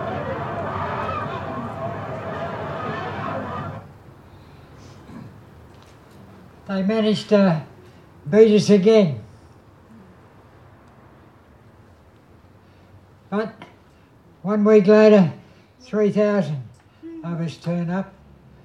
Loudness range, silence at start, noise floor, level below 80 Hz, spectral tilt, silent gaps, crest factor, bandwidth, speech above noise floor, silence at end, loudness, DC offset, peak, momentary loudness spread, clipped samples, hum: 17 LU; 0 s; -52 dBFS; -56 dBFS; -7 dB/octave; none; 22 dB; 10 kHz; 35 dB; 0.55 s; -20 LUFS; under 0.1%; -2 dBFS; 23 LU; under 0.1%; none